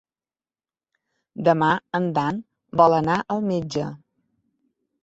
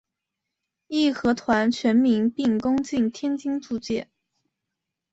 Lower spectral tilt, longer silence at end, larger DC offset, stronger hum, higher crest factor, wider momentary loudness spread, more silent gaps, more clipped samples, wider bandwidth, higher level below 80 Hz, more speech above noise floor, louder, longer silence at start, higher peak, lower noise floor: first, -7 dB/octave vs -5.5 dB/octave; about the same, 1.05 s vs 1.1 s; neither; neither; about the same, 22 dB vs 18 dB; first, 12 LU vs 9 LU; neither; neither; about the same, 8 kHz vs 8 kHz; about the same, -60 dBFS vs -58 dBFS; first, over 69 dB vs 61 dB; about the same, -22 LUFS vs -23 LUFS; first, 1.35 s vs 0.9 s; first, -2 dBFS vs -8 dBFS; first, under -90 dBFS vs -84 dBFS